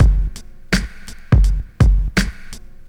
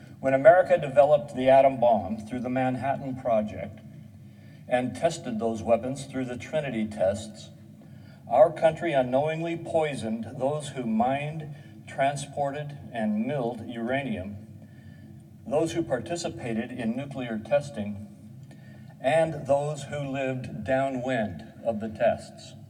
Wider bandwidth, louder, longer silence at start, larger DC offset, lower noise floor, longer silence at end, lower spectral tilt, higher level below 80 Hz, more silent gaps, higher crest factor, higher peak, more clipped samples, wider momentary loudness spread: first, 13 kHz vs 11.5 kHz; first, -19 LUFS vs -27 LUFS; about the same, 0 s vs 0 s; neither; second, -33 dBFS vs -47 dBFS; first, 0.2 s vs 0.05 s; about the same, -5.5 dB/octave vs -6 dB/octave; first, -18 dBFS vs -64 dBFS; neither; second, 16 dB vs 22 dB; first, 0 dBFS vs -4 dBFS; neither; about the same, 22 LU vs 20 LU